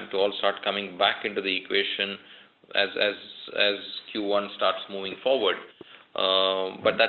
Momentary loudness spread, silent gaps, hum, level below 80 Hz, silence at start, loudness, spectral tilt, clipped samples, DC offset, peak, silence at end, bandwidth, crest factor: 10 LU; none; none; -72 dBFS; 0 s; -26 LUFS; -6 dB/octave; under 0.1%; under 0.1%; -8 dBFS; 0 s; 5 kHz; 20 dB